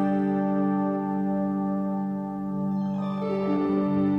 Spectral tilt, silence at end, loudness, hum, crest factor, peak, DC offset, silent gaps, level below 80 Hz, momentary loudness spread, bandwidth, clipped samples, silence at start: -10.5 dB/octave; 0 s; -27 LUFS; none; 10 dB; -14 dBFS; under 0.1%; none; -58 dBFS; 5 LU; 5.2 kHz; under 0.1%; 0 s